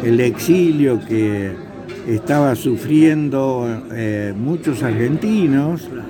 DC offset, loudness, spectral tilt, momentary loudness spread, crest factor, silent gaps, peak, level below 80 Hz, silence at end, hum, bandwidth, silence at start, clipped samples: under 0.1%; -17 LUFS; -7 dB/octave; 10 LU; 16 dB; none; -2 dBFS; -50 dBFS; 0 s; none; 18 kHz; 0 s; under 0.1%